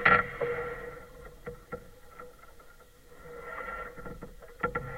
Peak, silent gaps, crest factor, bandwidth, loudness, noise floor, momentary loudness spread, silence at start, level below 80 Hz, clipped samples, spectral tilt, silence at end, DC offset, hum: -8 dBFS; none; 26 dB; 16 kHz; -34 LUFS; -54 dBFS; 19 LU; 0 s; -52 dBFS; under 0.1%; -5.5 dB/octave; 0 s; under 0.1%; none